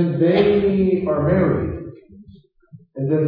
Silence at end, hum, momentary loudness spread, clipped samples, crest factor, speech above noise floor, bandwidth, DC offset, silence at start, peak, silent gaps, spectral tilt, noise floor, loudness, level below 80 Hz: 0 s; none; 17 LU; under 0.1%; 16 dB; 31 dB; 5.2 kHz; under 0.1%; 0 s; -2 dBFS; none; -11 dB/octave; -48 dBFS; -18 LUFS; -42 dBFS